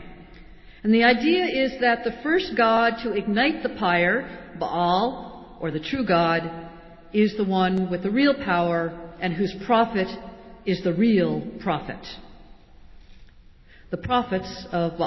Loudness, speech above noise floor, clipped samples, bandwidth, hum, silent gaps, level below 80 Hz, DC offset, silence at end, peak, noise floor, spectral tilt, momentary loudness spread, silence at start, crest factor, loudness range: -23 LUFS; 27 dB; under 0.1%; 6 kHz; none; none; -50 dBFS; under 0.1%; 0 s; -6 dBFS; -49 dBFS; -7 dB/octave; 14 LU; 0 s; 18 dB; 6 LU